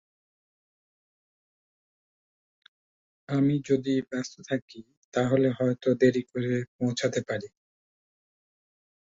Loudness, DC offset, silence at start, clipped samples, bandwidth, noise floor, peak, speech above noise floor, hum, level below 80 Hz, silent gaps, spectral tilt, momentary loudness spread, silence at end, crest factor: -27 LUFS; under 0.1%; 3.3 s; under 0.1%; 7.8 kHz; under -90 dBFS; -8 dBFS; over 63 dB; none; -68 dBFS; 4.62-4.68 s, 4.97-5.12 s, 6.68-6.79 s; -6.5 dB/octave; 11 LU; 1.6 s; 22 dB